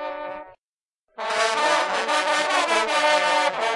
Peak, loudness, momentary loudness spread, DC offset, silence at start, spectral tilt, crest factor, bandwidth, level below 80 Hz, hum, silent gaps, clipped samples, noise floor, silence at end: -4 dBFS; -21 LUFS; 14 LU; under 0.1%; 0 s; -0.5 dB/octave; 18 dB; 11.5 kHz; -68 dBFS; none; 0.59-1.07 s; under 0.1%; under -90 dBFS; 0 s